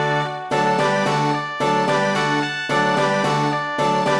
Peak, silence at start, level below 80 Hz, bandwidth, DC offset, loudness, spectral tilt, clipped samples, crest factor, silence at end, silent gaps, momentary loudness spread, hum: -6 dBFS; 0 s; -64 dBFS; 11 kHz; 0.1%; -19 LUFS; -5 dB/octave; under 0.1%; 12 dB; 0 s; none; 3 LU; none